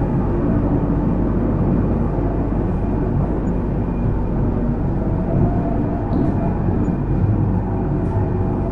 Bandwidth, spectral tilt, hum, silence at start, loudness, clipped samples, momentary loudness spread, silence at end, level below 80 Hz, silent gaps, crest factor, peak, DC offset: 3.6 kHz; -11.5 dB/octave; none; 0 s; -20 LUFS; under 0.1%; 3 LU; 0 s; -24 dBFS; none; 14 dB; -4 dBFS; under 0.1%